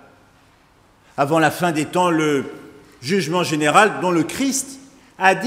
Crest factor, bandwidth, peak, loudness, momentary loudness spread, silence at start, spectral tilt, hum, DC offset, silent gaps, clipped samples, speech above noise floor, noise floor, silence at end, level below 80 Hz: 20 dB; 16 kHz; 0 dBFS; -18 LUFS; 11 LU; 1.15 s; -4 dB/octave; none; under 0.1%; none; under 0.1%; 36 dB; -54 dBFS; 0 s; -60 dBFS